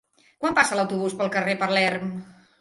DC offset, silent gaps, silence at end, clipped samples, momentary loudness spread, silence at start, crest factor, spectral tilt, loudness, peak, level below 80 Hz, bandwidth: under 0.1%; none; 0.3 s; under 0.1%; 10 LU; 0.4 s; 22 dB; -4 dB/octave; -23 LUFS; -4 dBFS; -62 dBFS; 11.5 kHz